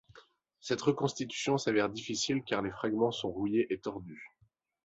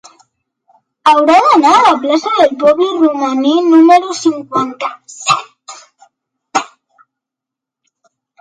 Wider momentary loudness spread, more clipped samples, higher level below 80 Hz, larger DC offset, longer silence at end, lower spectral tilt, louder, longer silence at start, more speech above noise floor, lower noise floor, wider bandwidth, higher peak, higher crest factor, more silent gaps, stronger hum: about the same, 12 LU vs 12 LU; neither; about the same, -66 dBFS vs -62 dBFS; neither; second, 0.6 s vs 1.75 s; about the same, -4.5 dB/octave vs -3.5 dB/octave; second, -33 LUFS vs -11 LUFS; second, 0.15 s vs 1.05 s; second, 39 dB vs 73 dB; second, -72 dBFS vs -83 dBFS; second, 8.2 kHz vs 10.5 kHz; second, -14 dBFS vs 0 dBFS; first, 18 dB vs 12 dB; neither; neither